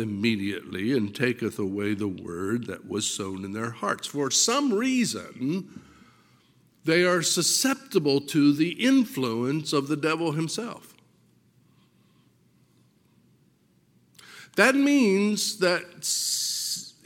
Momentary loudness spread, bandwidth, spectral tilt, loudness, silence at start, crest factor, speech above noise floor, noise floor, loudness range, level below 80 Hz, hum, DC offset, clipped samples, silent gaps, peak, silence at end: 11 LU; 17 kHz; -3.5 dB/octave; -25 LUFS; 0 s; 24 dB; 38 dB; -64 dBFS; 7 LU; -72 dBFS; none; under 0.1%; under 0.1%; none; -4 dBFS; 0.15 s